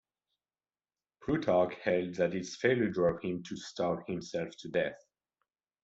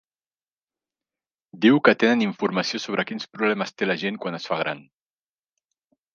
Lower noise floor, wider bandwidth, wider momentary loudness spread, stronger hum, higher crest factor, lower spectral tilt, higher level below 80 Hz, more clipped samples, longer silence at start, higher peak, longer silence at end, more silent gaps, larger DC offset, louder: about the same, under -90 dBFS vs under -90 dBFS; first, 8 kHz vs 7.2 kHz; second, 9 LU vs 12 LU; neither; about the same, 20 dB vs 22 dB; about the same, -6 dB/octave vs -5 dB/octave; first, -66 dBFS vs -76 dBFS; neither; second, 1.2 s vs 1.55 s; second, -14 dBFS vs -2 dBFS; second, 0.85 s vs 1.35 s; neither; neither; second, -33 LUFS vs -23 LUFS